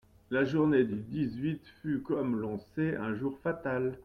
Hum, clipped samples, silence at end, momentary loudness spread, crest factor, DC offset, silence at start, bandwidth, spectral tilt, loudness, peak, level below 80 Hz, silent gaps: none; under 0.1%; 0.05 s; 9 LU; 16 dB; under 0.1%; 0.3 s; 6.6 kHz; -9 dB/octave; -32 LUFS; -14 dBFS; -62 dBFS; none